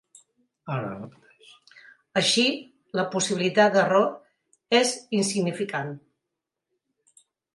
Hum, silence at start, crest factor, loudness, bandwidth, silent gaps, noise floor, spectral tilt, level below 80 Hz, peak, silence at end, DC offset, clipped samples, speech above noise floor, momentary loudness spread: none; 0.65 s; 22 dB; -24 LUFS; 11.5 kHz; none; -85 dBFS; -3.5 dB/octave; -74 dBFS; -6 dBFS; 1.55 s; under 0.1%; under 0.1%; 61 dB; 18 LU